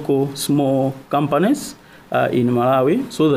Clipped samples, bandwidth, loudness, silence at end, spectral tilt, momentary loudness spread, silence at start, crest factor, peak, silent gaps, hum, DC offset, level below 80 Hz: under 0.1%; 15.5 kHz; -18 LUFS; 0 s; -6 dB/octave; 6 LU; 0 s; 12 dB; -6 dBFS; none; none; under 0.1%; -56 dBFS